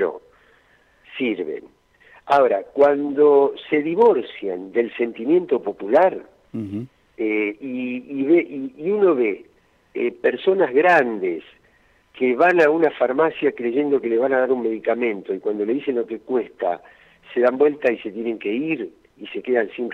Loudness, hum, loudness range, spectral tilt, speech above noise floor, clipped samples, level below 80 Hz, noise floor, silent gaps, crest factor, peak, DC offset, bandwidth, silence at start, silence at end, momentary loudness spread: -20 LUFS; none; 4 LU; -7 dB/octave; 38 dB; under 0.1%; -66 dBFS; -58 dBFS; none; 16 dB; -6 dBFS; under 0.1%; 6.8 kHz; 0 s; 0 s; 14 LU